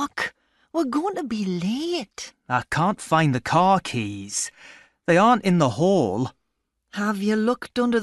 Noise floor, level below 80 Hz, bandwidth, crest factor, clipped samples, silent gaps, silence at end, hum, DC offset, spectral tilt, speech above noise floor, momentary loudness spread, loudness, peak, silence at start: -77 dBFS; -58 dBFS; 12 kHz; 18 dB; under 0.1%; none; 0 s; none; under 0.1%; -5.5 dB/octave; 55 dB; 12 LU; -23 LUFS; -6 dBFS; 0 s